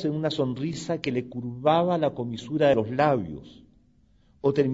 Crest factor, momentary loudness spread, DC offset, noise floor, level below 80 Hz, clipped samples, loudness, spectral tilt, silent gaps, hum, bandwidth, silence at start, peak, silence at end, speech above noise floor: 18 dB; 10 LU; under 0.1%; -61 dBFS; -58 dBFS; under 0.1%; -26 LUFS; -7 dB/octave; none; none; 7.8 kHz; 0 s; -8 dBFS; 0 s; 36 dB